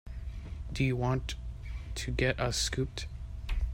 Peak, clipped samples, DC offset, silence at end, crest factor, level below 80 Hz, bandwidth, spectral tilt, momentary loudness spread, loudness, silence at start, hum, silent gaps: -14 dBFS; under 0.1%; under 0.1%; 0 s; 20 dB; -38 dBFS; 16 kHz; -4.5 dB/octave; 13 LU; -34 LUFS; 0.05 s; none; none